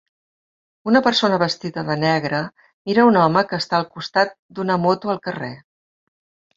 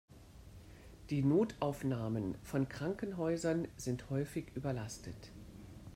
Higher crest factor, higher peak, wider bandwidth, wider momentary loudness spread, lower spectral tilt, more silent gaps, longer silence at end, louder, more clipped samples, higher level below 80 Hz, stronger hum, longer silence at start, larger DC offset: about the same, 20 dB vs 18 dB; first, -2 dBFS vs -20 dBFS; second, 7.8 kHz vs 16 kHz; second, 13 LU vs 24 LU; about the same, -6 dB/octave vs -7 dB/octave; first, 2.73-2.85 s, 4.39-4.49 s vs none; first, 1 s vs 0 s; first, -19 LUFS vs -38 LUFS; neither; about the same, -60 dBFS vs -60 dBFS; neither; first, 0.85 s vs 0.1 s; neither